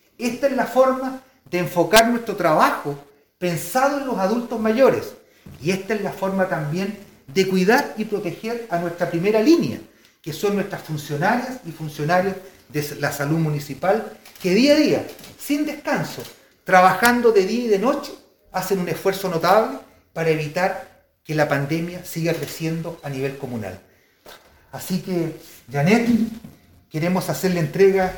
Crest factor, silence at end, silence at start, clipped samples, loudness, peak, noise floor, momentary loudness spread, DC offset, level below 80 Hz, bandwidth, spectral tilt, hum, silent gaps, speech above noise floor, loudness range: 22 dB; 0 s; 0.2 s; under 0.1%; -21 LUFS; 0 dBFS; -47 dBFS; 16 LU; 0.1%; -56 dBFS; 19 kHz; -5.5 dB/octave; none; none; 27 dB; 6 LU